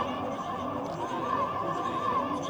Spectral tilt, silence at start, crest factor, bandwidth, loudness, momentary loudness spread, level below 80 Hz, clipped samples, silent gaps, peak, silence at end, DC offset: -5.5 dB/octave; 0 s; 14 dB; over 20 kHz; -31 LUFS; 4 LU; -60 dBFS; under 0.1%; none; -18 dBFS; 0 s; under 0.1%